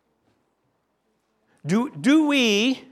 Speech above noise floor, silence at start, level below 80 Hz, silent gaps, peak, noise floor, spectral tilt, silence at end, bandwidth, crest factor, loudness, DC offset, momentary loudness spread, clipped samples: 51 dB; 1.65 s; -76 dBFS; none; -8 dBFS; -71 dBFS; -4.5 dB/octave; 0.1 s; 13.5 kHz; 16 dB; -20 LUFS; under 0.1%; 7 LU; under 0.1%